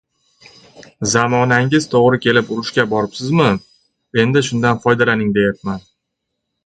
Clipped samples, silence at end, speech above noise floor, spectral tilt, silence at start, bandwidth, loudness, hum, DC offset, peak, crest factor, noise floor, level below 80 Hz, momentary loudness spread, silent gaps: under 0.1%; 0.85 s; 61 dB; -5 dB/octave; 0.8 s; 9.4 kHz; -16 LUFS; none; under 0.1%; 0 dBFS; 16 dB; -76 dBFS; -50 dBFS; 9 LU; none